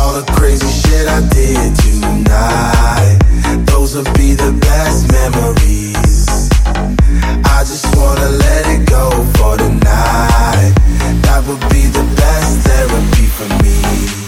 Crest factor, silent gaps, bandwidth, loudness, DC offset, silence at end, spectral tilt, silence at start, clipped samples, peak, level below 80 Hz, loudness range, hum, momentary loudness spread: 8 dB; none; 16.5 kHz; -11 LUFS; under 0.1%; 0 s; -5.5 dB/octave; 0 s; under 0.1%; 0 dBFS; -10 dBFS; 1 LU; none; 3 LU